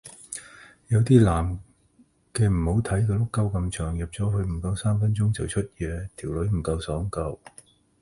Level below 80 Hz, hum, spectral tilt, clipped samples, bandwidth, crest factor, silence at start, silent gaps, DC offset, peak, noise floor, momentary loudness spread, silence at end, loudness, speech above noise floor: -38 dBFS; none; -7 dB/octave; under 0.1%; 11.5 kHz; 20 dB; 0.05 s; none; under 0.1%; -4 dBFS; -61 dBFS; 14 LU; 0.65 s; -25 LUFS; 37 dB